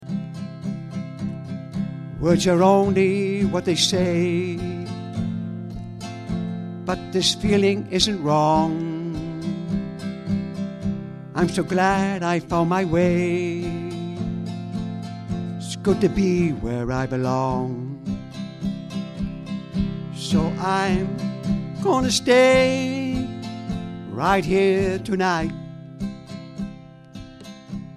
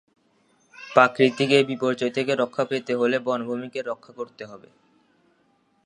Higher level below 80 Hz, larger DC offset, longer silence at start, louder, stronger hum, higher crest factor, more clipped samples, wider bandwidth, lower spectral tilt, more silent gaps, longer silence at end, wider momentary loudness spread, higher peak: first, -44 dBFS vs -76 dBFS; neither; second, 0 s vs 0.8 s; about the same, -23 LUFS vs -23 LUFS; neither; about the same, 20 dB vs 24 dB; neither; first, 13.5 kHz vs 11 kHz; about the same, -5.5 dB/octave vs -5.5 dB/octave; neither; second, 0 s vs 1.3 s; second, 14 LU vs 18 LU; second, -4 dBFS vs 0 dBFS